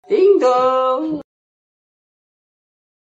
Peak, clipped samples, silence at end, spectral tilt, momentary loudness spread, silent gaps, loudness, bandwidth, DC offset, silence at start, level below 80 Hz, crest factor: -2 dBFS; under 0.1%; 1.85 s; -5.5 dB/octave; 12 LU; none; -15 LUFS; 7.8 kHz; under 0.1%; 0.1 s; -66 dBFS; 16 dB